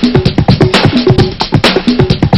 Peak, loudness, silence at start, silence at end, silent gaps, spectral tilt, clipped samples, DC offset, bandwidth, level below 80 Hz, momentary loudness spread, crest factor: 0 dBFS; -9 LUFS; 0 s; 0 s; none; -6.5 dB/octave; 2%; under 0.1%; 11.5 kHz; -24 dBFS; 3 LU; 8 dB